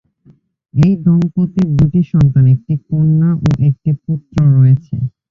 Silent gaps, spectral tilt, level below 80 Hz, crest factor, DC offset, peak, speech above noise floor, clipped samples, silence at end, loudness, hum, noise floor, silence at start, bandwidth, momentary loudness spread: none; -10 dB/octave; -36 dBFS; 12 dB; under 0.1%; -2 dBFS; 38 dB; under 0.1%; 0.2 s; -13 LUFS; none; -49 dBFS; 0.75 s; 6.8 kHz; 9 LU